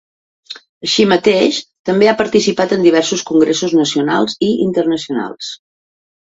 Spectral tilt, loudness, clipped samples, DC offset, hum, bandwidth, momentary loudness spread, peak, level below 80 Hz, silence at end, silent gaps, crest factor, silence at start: -4.5 dB/octave; -14 LUFS; under 0.1%; under 0.1%; none; 8 kHz; 15 LU; 0 dBFS; -56 dBFS; 0.8 s; 0.69-0.81 s, 1.79-1.85 s; 14 dB; 0.5 s